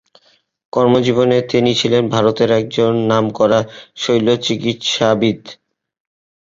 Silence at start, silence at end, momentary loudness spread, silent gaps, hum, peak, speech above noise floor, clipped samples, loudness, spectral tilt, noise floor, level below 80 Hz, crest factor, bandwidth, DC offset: 0.75 s; 0.95 s; 5 LU; none; none; -2 dBFS; 41 dB; under 0.1%; -15 LUFS; -5.5 dB/octave; -56 dBFS; -54 dBFS; 14 dB; 7.8 kHz; under 0.1%